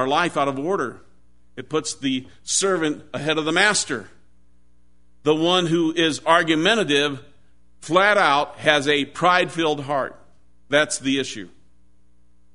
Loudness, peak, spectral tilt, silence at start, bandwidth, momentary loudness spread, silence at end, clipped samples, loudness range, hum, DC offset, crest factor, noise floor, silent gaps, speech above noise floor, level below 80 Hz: -20 LUFS; 0 dBFS; -3 dB/octave; 0 s; 11 kHz; 10 LU; 1.05 s; under 0.1%; 4 LU; none; 0.5%; 22 dB; -61 dBFS; none; 40 dB; -60 dBFS